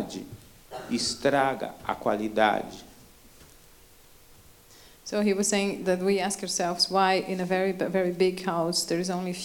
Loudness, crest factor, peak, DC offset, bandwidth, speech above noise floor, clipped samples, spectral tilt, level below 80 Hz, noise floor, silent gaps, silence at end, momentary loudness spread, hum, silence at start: -26 LUFS; 20 dB; -8 dBFS; under 0.1%; 18 kHz; 27 dB; under 0.1%; -3.5 dB/octave; -60 dBFS; -54 dBFS; none; 0 s; 13 LU; none; 0 s